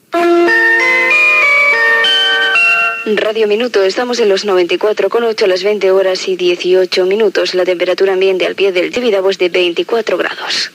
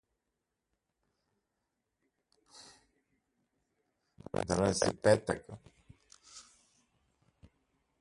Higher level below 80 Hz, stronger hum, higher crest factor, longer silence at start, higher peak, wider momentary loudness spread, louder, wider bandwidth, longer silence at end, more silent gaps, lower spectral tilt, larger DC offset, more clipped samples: second, -66 dBFS vs -60 dBFS; neither; second, 10 dB vs 26 dB; second, 0.1 s vs 2.6 s; first, -2 dBFS vs -12 dBFS; second, 7 LU vs 26 LU; first, -11 LUFS vs -31 LUFS; first, 15.5 kHz vs 11.5 kHz; second, 0.05 s vs 1.6 s; neither; second, -3 dB/octave vs -4.5 dB/octave; neither; neither